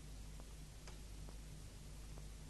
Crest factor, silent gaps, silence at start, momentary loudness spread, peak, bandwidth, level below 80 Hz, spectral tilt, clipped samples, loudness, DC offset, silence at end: 14 dB; none; 0 s; 1 LU; -40 dBFS; 12 kHz; -54 dBFS; -4.5 dB/octave; under 0.1%; -56 LUFS; under 0.1%; 0 s